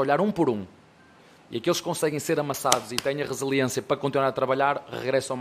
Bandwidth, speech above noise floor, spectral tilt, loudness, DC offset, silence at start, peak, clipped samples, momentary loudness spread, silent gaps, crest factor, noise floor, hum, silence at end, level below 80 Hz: 15.5 kHz; 29 dB; -4 dB/octave; -26 LUFS; under 0.1%; 0 s; -2 dBFS; under 0.1%; 6 LU; none; 24 dB; -54 dBFS; none; 0 s; -64 dBFS